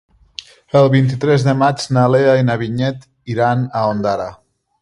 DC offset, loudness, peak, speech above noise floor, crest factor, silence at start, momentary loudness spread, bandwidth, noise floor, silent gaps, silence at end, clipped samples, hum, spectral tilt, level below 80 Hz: under 0.1%; -15 LUFS; 0 dBFS; 23 dB; 16 dB; 0.75 s; 19 LU; 11 kHz; -37 dBFS; none; 0.5 s; under 0.1%; none; -7 dB/octave; -50 dBFS